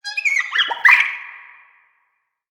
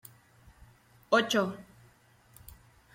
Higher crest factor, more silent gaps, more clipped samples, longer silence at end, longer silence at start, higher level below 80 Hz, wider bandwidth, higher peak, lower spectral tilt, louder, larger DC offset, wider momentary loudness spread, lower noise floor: about the same, 20 dB vs 24 dB; neither; neither; second, 1.1 s vs 1.3 s; second, 0.05 s vs 1.1 s; second, -78 dBFS vs -64 dBFS; first, over 20 kHz vs 16.5 kHz; first, 0 dBFS vs -10 dBFS; second, 3 dB/octave vs -4 dB/octave; first, -14 LUFS vs -28 LUFS; neither; second, 17 LU vs 28 LU; first, -69 dBFS vs -62 dBFS